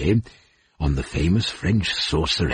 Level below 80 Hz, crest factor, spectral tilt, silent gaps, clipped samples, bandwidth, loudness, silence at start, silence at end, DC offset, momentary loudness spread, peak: -32 dBFS; 14 dB; -5.5 dB/octave; none; under 0.1%; 10 kHz; -22 LUFS; 0 s; 0 s; under 0.1%; 5 LU; -8 dBFS